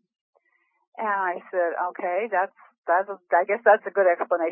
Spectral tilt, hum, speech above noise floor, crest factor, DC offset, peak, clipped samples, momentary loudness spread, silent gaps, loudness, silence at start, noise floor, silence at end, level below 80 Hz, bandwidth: -8.5 dB/octave; none; 46 dB; 20 dB; under 0.1%; -4 dBFS; under 0.1%; 8 LU; 2.78-2.83 s; -24 LUFS; 1 s; -70 dBFS; 0 s; under -90 dBFS; 3.2 kHz